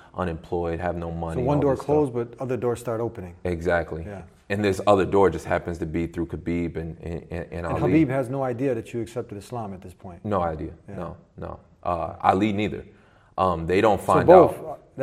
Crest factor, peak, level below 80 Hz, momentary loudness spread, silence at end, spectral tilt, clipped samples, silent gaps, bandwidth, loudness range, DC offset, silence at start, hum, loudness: 24 dB; 0 dBFS; -50 dBFS; 16 LU; 0 s; -7.5 dB/octave; under 0.1%; none; 15 kHz; 8 LU; under 0.1%; 0.15 s; none; -24 LUFS